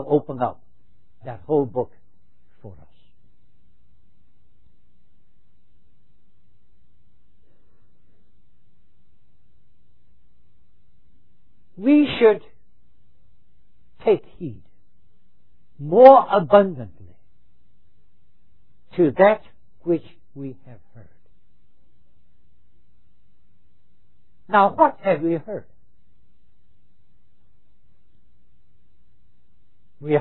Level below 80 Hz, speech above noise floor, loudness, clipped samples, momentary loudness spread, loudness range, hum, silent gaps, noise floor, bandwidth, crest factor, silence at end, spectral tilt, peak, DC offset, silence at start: -62 dBFS; 47 dB; -18 LUFS; under 0.1%; 23 LU; 13 LU; none; none; -65 dBFS; 5 kHz; 24 dB; 0 s; -10 dB/octave; 0 dBFS; 1%; 0 s